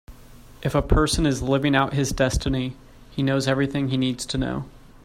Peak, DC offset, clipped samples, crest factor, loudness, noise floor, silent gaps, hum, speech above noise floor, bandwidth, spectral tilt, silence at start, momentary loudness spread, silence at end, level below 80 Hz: -4 dBFS; under 0.1%; under 0.1%; 18 dB; -23 LUFS; -45 dBFS; none; none; 23 dB; 15.5 kHz; -5.5 dB/octave; 0.1 s; 10 LU; 0.3 s; -34 dBFS